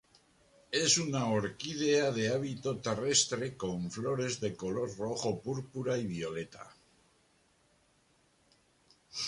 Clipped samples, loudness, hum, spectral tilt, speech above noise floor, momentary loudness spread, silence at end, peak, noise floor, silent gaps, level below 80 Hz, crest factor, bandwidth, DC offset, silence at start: under 0.1%; -33 LUFS; none; -3.5 dB/octave; 37 dB; 11 LU; 0 s; -14 dBFS; -70 dBFS; none; -66 dBFS; 22 dB; 11.5 kHz; under 0.1%; 0.7 s